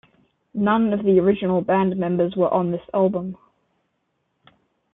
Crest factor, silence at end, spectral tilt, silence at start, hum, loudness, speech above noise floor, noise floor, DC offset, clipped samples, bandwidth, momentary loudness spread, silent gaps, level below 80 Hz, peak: 16 dB; 1.6 s; -11.5 dB/octave; 0.55 s; none; -20 LUFS; 53 dB; -72 dBFS; under 0.1%; under 0.1%; 3.9 kHz; 6 LU; none; -58 dBFS; -6 dBFS